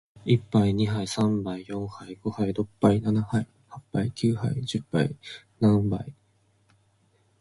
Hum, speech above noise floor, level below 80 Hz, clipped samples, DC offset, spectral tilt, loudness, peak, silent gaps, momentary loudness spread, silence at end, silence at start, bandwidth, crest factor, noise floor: none; 40 dB; -52 dBFS; under 0.1%; under 0.1%; -7 dB/octave; -26 LUFS; -6 dBFS; none; 12 LU; 1.3 s; 0.25 s; 11.5 kHz; 20 dB; -66 dBFS